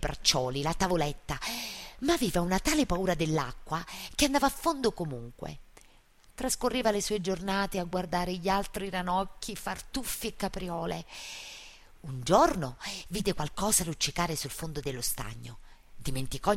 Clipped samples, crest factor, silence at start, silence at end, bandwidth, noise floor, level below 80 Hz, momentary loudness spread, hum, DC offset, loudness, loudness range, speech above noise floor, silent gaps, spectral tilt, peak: under 0.1%; 22 dB; 0 s; 0 s; 16 kHz; -59 dBFS; -44 dBFS; 14 LU; none; under 0.1%; -30 LUFS; 4 LU; 28 dB; none; -3.5 dB/octave; -8 dBFS